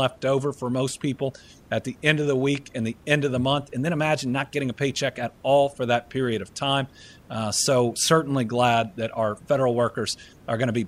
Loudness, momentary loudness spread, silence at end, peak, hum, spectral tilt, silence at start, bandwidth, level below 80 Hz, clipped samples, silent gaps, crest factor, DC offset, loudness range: -24 LUFS; 9 LU; 0 s; -4 dBFS; none; -4.5 dB/octave; 0 s; 15.5 kHz; -58 dBFS; under 0.1%; none; 20 dB; under 0.1%; 2 LU